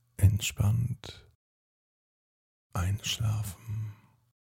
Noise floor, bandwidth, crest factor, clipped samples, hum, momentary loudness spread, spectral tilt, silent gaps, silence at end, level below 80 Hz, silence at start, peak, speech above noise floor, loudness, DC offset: under -90 dBFS; 17 kHz; 22 dB; under 0.1%; none; 14 LU; -4.5 dB/octave; 1.35-2.70 s; 0.55 s; -46 dBFS; 0.2 s; -10 dBFS; over 59 dB; -31 LUFS; under 0.1%